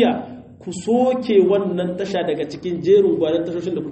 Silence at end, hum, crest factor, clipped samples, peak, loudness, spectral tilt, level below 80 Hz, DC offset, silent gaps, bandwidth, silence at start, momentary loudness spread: 0 s; none; 16 dB; under 0.1%; -4 dBFS; -19 LUFS; -6.5 dB/octave; -58 dBFS; under 0.1%; none; 8.4 kHz; 0 s; 13 LU